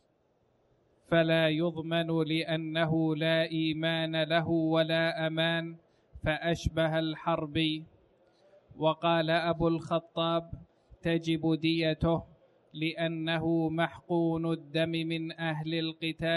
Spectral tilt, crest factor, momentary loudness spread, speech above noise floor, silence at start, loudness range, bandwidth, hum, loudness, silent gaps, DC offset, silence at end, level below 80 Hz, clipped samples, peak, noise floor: -7 dB/octave; 16 dB; 7 LU; 41 dB; 1.1 s; 3 LU; 11.5 kHz; none; -30 LUFS; none; under 0.1%; 0 s; -54 dBFS; under 0.1%; -14 dBFS; -71 dBFS